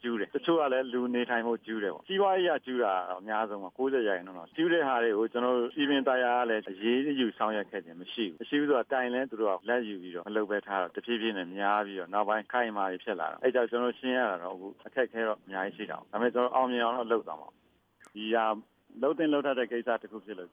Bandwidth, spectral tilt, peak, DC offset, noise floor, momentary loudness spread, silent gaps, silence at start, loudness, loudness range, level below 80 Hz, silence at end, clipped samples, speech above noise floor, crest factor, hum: 5 kHz; -7 dB/octave; -14 dBFS; under 0.1%; -62 dBFS; 9 LU; none; 0.05 s; -30 LUFS; 3 LU; -86 dBFS; 0.05 s; under 0.1%; 32 dB; 18 dB; none